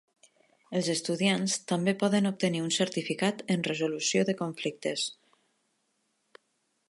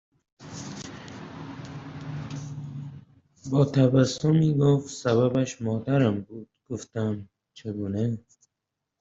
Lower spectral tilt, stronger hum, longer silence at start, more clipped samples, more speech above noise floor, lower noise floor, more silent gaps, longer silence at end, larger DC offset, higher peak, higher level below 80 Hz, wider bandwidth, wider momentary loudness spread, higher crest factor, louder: second, -4 dB/octave vs -7 dB/octave; neither; first, 0.7 s vs 0.4 s; neither; second, 47 dB vs 60 dB; second, -76 dBFS vs -84 dBFS; neither; first, 1.75 s vs 0.8 s; neither; second, -12 dBFS vs -8 dBFS; second, -80 dBFS vs -62 dBFS; first, 11.5 kHz vs 7.8 kHz; second, 6 LU vs 19 LU; about the same, 18 dB vs 18 dB; second, -29 LUFS vs -25 LUFS